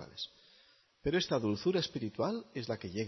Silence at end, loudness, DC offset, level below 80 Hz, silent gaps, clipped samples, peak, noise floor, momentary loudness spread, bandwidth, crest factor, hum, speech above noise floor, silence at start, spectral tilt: 0 s; -35 LUFS; under 0.1%; -60 dBFS; none; under 0.1%; -18 dBFS; -66 dBFS; 11 LU; 6.2 kHz; 18 dB; none; 32 dB; 0 s; -4.5 dB/octave